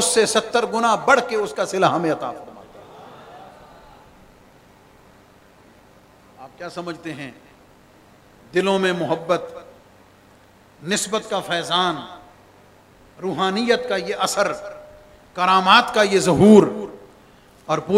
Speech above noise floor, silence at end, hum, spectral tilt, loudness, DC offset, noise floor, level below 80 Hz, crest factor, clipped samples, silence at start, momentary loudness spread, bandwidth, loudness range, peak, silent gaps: 32 dB; 0 s; none; -4 dB/octave; -19 LUFS; under 0.1%; -51 dBFS; -58 dBFS; 22 dB; under 0.1%; 0 s; 23 LU; 16 kHz; 20 LU; 0 dBFS; none